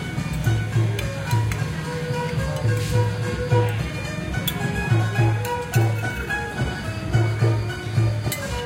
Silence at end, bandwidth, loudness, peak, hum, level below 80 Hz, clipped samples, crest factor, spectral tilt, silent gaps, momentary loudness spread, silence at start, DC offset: 0 s; 16.5 kHz; -23 LUFS; -8 dBFS; none; -36 dBFS; under 0.1%; 14 dB; -6 dB/octave; none; 6 LU; 0 s; under 0.1%